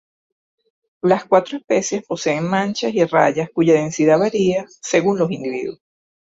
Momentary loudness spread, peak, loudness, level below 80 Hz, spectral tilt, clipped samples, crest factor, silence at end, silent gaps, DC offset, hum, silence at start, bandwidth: 8 LU; -2 dBFS; -18 LUFS; -62 dBFS; -5 dB/octave; under 0.1%; 18 dB; 0.65 s; none; under 0.1%; none; 1.05 s; 8 kHz